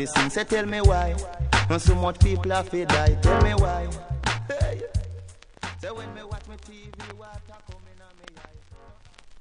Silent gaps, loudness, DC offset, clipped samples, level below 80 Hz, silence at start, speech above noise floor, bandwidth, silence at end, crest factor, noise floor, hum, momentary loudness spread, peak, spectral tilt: none; -24 LUFS; under 0.1%; under 0.1%; -28 dBFS; 0 s; 26 dB; 10.5 kHz; 0 s; 20 dB; -49 dBFS; none; 21 LU; -4 dBFS; -5.5 dB/octave